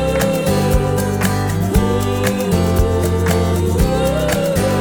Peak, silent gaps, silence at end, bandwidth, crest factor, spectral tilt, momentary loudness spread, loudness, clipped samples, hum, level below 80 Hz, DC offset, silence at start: -2 dBFS; none; 0 s; over 20 kHz; 14 dB; -6 dB/octave; 2 LU; -16 LUFS; under 0.1%; none; -24 dBFS; under 0.1%; 0 s